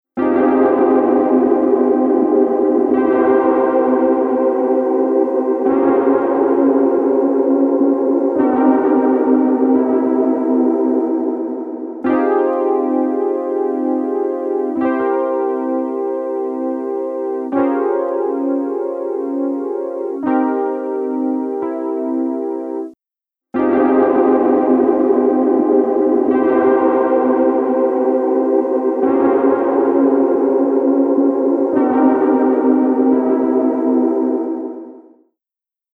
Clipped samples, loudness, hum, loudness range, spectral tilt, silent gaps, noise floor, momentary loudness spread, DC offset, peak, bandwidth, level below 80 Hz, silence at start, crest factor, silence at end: under 0.1%; -15 LUFS; none; 6 LU; -9 dB/octave; none; -89 dBFS; 8 LU; under 0.1%; -2 dBFS; 3.3 kHz; -62 dBFS; 0.15 s; 14 dB; 0.95 s